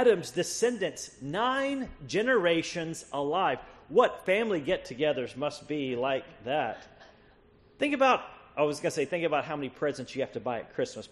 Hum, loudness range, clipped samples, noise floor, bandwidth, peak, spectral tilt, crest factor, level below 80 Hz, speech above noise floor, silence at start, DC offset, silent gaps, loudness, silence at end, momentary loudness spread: none; 3 LU; under 0.1%; -60 dBFS; 12 kHz; -10 dBFS; -4 dB/octave; 20 dB; -62 dBFS; 30 dB; 0 s; under 0.1%; none; -30 LUFS; 0.05 s; 10 LU